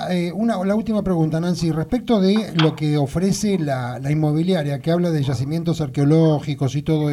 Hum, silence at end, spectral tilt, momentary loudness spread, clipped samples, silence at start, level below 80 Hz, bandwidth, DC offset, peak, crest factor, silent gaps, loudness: none; 0 s; -7 dB/octave; 5 LU; under 0.1%; 0 s; -46 dBFS; 13.5 kHz; under 0.1%; -4 dBFS; 16 dB; none; -20 LUFS